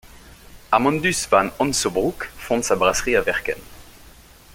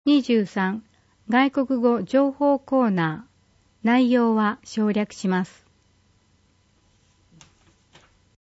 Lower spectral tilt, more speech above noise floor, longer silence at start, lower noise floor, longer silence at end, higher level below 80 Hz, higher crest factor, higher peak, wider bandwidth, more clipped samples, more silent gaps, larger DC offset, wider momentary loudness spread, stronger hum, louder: second, -3.5 dB/octave vs -6.5 dB/octave; second, 26 dB vs 41 dB; about the same, 0.15 s vs 0.05 s; second, -47 dBFS vs -62 dBFS; second, 0.45 s vs 3 s; first, -44 dBFS vs -66 dBFS; about the same, 20 dB vs 16 dB; first, -2 dBFS vs -8 dBFS; first, 17 kHz vs 8 kHz; neither; neither; neither; about the same, 8 LU vs 8 LU; neither; about the same, -20 LUFS vs -22 LUFS